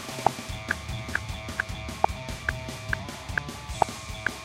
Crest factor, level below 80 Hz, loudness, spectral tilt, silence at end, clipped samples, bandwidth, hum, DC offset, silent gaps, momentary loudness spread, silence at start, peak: 26 dB; -42 dBFS; -31 LUFS; -4 dB/octave; 0 s; under 0.1%; 16 kHz; none; under 0.1%; none; 5 LU; 0 s; -6 dBFS